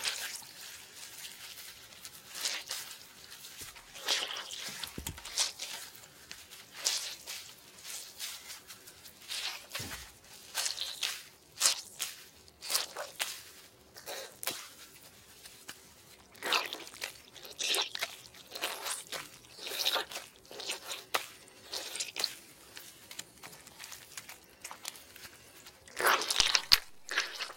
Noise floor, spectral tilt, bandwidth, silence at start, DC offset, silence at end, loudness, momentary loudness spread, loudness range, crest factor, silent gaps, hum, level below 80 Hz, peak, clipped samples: -57 dBFS; 0.5 dB/octave; 17 kHz; 0 s; under 0.1%; 0 s; -35 LUFS; 20 LU; 7 LU; 38 dB; none; none; -66 dBFS; -2 dBFS; under 0.1%